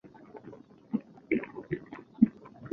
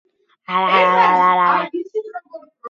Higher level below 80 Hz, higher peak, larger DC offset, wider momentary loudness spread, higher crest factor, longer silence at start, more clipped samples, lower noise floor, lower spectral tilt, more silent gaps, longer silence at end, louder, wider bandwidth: first, -66 dBFS vs -72 dBFS; second, -8 dBFS vs -2 dBFS; neither; first, 23 LU vs 15 LU; first, 26 dB vs 16 dB; second, 0.05 s vs 0.5 s; neither; first, -51 dBFS vs -37 dBFS; first, -10 dB/octave vs -5.5 dB/octave; neither; about the same, 0 s vs 0 s; second, -32 LUFS vs -15 LUFS; second, 4 kHz vs 7.2 kHz